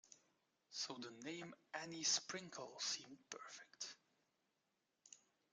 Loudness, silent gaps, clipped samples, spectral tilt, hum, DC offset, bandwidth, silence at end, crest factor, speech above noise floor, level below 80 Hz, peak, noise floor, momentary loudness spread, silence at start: -46 LUFS; none; under 0.1%; -1 dB/octave; none; under 0.1%; 11.5 kHz; 0.35 s; 26 dB; 39 dB; under -90 dBFS; -26 dBFS; -88 dBFS; 25 LU; 0.05 s